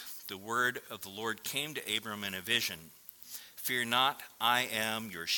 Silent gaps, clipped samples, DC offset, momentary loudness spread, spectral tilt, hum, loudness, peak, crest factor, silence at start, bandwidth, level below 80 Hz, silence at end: none; under 0.1%; under 0.1%; 16 LU; -1.5 dB/octave; none; -33 LUFS; -12 dBFS; 24 dB; 0 s; 18 kHz; -76 dBFS; 0 s